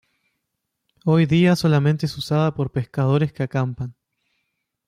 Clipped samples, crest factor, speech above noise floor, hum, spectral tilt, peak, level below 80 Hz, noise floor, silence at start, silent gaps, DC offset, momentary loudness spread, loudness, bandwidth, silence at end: under 0.1%; 14 dB; 59 dB; none; -7.5 dB/octave; -8 dBFS; -54 dBFS; -78 dBFS; 1.05 s; none; under 0.1%; 10 LU; -20 LUFS; 13.5 kHz; 0.95 s